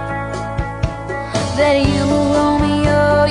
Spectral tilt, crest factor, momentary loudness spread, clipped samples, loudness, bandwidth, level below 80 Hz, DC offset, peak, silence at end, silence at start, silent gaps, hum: -6 dB/octave; 14 dB; 9 LU; under 0.1%; -16 LUFS; 11 kHz; -30 dBFS; under 0.1%; -2 dBFS; 0 s; 0 s; none; none